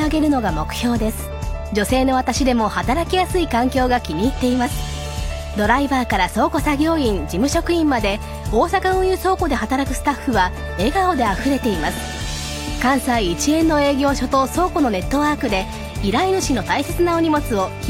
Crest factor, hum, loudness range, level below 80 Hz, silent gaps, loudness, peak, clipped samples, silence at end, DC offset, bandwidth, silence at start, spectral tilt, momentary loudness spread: 18 dB; none; 1 LU; -30 dBFS; none; -19 LUFS; -2 dBFS; under 0.1%; 0 s; under 0.1%; 17 kHz; 0 s; -5 dB/octave; 7 LU